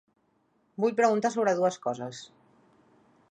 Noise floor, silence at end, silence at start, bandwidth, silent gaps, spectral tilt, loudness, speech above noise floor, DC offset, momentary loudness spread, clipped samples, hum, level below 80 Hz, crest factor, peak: -70 dBFS; 1.05 s; 0.8 s; 9.8 kHz; none; -5 dB/octave; -27 LUFS; 43 dB; under 0.1%; 17 LU; under 0.1%; none; -80 dBFS; 20 dB; -10 dBFS